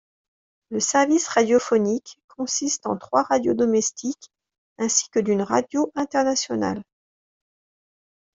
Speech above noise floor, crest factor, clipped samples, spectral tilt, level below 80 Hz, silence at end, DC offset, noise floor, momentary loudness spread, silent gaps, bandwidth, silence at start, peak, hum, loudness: over 68 dB; 20 dB; under 0.1%; -3.5 dB/octave; -66 dBFS; 1.55 s; under 0.1%; under -90 dBFS; 10 LU; 2.24-2.28 s, 4.58-4.76 s; 8 kHz; 0.7 s; -4 dBFS; none; -22 LUFS